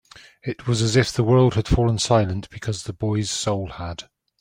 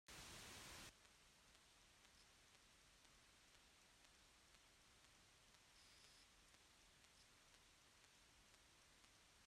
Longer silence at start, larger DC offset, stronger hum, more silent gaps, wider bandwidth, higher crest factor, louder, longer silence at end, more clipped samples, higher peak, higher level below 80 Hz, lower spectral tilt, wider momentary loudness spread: first, 0.45 s vs 0.1 s; neither; neither; neither; about the same, 15.5 kHz vs 16 kHz; about the same, 18 dB vs 22 dB; first, -21 LUFS vs -63 LUFS; first, 0.4 s vs 0 s; neither; first, -4 dBFS vs -48 dBFS; first, -38 dBFS vs -80 dBFS; first, -5.5 dB/octave vs -1.5 dB/octave; first, 15 LU vs 12 LU